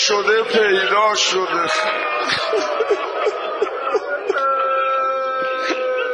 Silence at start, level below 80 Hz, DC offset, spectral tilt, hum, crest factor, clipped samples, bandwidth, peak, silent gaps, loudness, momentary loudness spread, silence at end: 0 s; -64 dBFS; under 0.1%; -1.5 dB/octave; none; 16 dB; under 0.1%; 11 kHz; -2 dBFS; none; -18 LUFS; 7 LU; 0 s